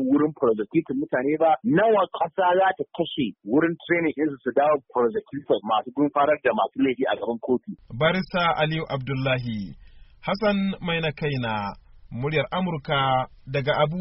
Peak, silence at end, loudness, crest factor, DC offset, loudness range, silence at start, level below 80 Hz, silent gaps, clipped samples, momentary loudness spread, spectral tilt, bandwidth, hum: -8 dBFS; 0 s; -24 LUFS; 16 dB; under 0.1%; 4 LU; 0 s; -52 dBFS; none; under 0.1%; 8 LU; -4.5 dB/octave; 5.8 kHz; none